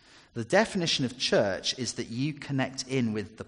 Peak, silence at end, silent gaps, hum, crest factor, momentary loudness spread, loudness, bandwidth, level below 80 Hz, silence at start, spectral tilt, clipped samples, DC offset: -8 dBFS; 0.05 s; none; none; 20 dB; 7 LU; -28 LUFS; 10.5 kHz; -62 dBFS; 0.35 s; -4 dB/octave; under 0.1%; under 0.1%